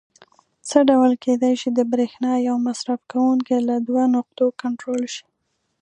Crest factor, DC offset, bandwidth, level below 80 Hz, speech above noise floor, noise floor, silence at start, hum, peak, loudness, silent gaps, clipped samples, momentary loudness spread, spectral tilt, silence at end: 18 dB; under 0.1%; 10 kHz; -72 dBFS; 35 dB; -54 dBFS; 0.65 s; none; -2 dBFS; -20 LUFS; none; under 0.1%; 10 LU; -4.5 dB/octave; 0.6 s